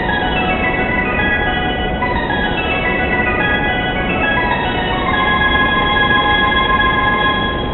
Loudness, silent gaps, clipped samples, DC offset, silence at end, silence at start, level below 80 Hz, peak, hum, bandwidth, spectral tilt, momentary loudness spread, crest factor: -14 LUFS; none; under 0.1%; under 0.1%; 0 s; 0 s; -26 dBFS; 0 dBFS; none; 4.3 kHz; -10.5 dB/octave; 4 LU; 14 dB